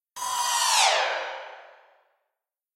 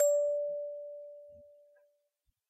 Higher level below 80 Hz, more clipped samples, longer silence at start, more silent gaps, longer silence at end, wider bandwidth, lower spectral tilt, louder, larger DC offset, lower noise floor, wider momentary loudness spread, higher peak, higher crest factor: first, -76 dBFS vs -84 dBFS; neither; first, 0.15 s vs 0 s; neither; about the same, 1.1 s vs 1.05 s; first, 16 kHz vs 12.5 kHz; second, 4 dB/octave vs -2 dB/octave; first, -23 LUFS vs -34 LUFS; neither; first, -85 dBFS vs -81 dBFS; second, 18 LU vs 23 LU; first, -8 dBFS vs -18 dBFS; about the same, 20 dB vs 18 dB